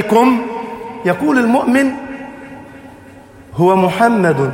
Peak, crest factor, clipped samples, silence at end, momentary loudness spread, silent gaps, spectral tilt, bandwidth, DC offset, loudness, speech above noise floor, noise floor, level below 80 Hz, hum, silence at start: 0 dBFS; 14 dB; under 0.1%; 0 s; 19 LU; none; -6.5 dB/octave; 16.5 kHz; under 0.1%; -14 LUFS; 26 dB; -39 dBFS; -52 dBFS; none; 0 s